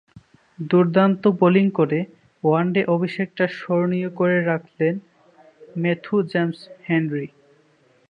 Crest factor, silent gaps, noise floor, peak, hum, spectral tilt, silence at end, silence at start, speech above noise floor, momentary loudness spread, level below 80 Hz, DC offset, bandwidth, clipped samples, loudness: 18 dB; none; -58 dBFS; -4 dBFS; none; -9.5 dB/octave; 0.85 s; 0.15 s; 39 dB; 12 LU; -68 dBFS; under 0.1%; 5.2 kHz; under 0.1%; -21 LUFS